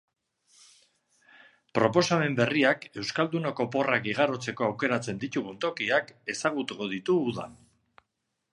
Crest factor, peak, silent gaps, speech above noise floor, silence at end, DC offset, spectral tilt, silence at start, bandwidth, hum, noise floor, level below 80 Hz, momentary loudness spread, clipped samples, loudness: 22 dB; -6 dBFS; none; 53 dB; 1 s; under 0.1%; -5 dB/octave; 1.75 s; 11.5 kHz; none; -81 dBFS; -70 dBFS; 9 LU; under 0.1%; -28 LUFS